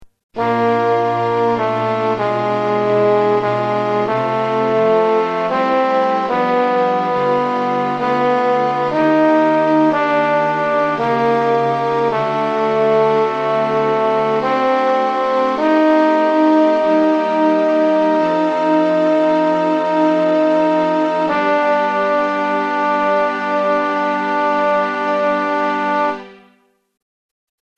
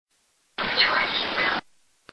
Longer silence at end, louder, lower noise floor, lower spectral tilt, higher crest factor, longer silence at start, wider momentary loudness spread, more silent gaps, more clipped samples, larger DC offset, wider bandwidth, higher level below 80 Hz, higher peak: first, 1.45 s vs 0.55 s; first, -15 LUFS vs -23 LUFS; second, -57 dBFS vs -67 dBFS; first, -6.5 dB/octave vs -3 dB/octave; second, 12 dB vs 20 dB; second, 0 s vs 0.6 s; second, 4 LU vs 11 LU; first, 0.23-0.29 s vs none; neither; neither; second, 8.4 kHz vs 11 kHz; about the same, -58 dBFS vs -58 dBFS; first, -2 dBFS vs -8 dBFS